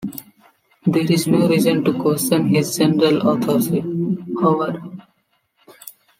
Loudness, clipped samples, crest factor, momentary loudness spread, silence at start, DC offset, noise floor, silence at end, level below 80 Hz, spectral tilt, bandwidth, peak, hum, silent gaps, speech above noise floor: -18 LUFS; under 0.1%; 16 dB; 16 LU; 0 s; under 0.1%; -65 dBFS; 0.3 s; -60 dBFS; -6 dB/octave; 16.5 kHz; -4 dBFS; none; none; 49 dB